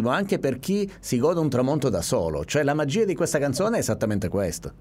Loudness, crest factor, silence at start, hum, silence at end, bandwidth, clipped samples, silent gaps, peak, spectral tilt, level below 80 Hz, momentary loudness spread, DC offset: -24 LUFS; 14 dB; 0 s; none; 0.05 s; 16 kHz; under 0.1%; none; -10 dBFS; -5.5 dB/octave; -48 dBFS; 4 LU; under 0.1%